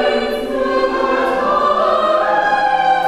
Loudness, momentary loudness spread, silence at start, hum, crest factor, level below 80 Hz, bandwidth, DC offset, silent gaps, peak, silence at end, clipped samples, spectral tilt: -15 LUFS; 4 LU; 0 s; none; 12 dB; -44 dBFS; 14 kHz; under 0.1%; none; -2 dBFS; 0 s; under 0.1%; -4 dB/octave